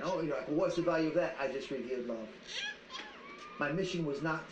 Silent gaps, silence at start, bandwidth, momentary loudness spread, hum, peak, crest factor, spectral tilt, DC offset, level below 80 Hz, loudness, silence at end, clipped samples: none; 0 s; 9 kHz; 13 LU; none; -20 dBFS; 16 dB; -5.5 dB/octave; under 0.1%; -64 dBFS; -36 LUFS; 0 s; under 0.1%